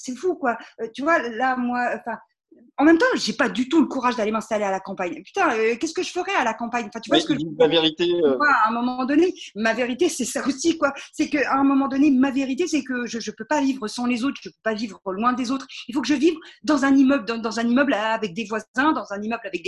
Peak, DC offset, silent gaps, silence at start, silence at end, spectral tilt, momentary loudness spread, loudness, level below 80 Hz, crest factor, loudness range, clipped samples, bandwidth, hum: -4 dBFS; under 0.1%; 18.68-18.74 s; 0 s; 0 s; -4 dB/octave; 10 LU; -22 LUFS; -62 dBFS; 18 dB; 4 LU; under 0.1%; 12 kHz; none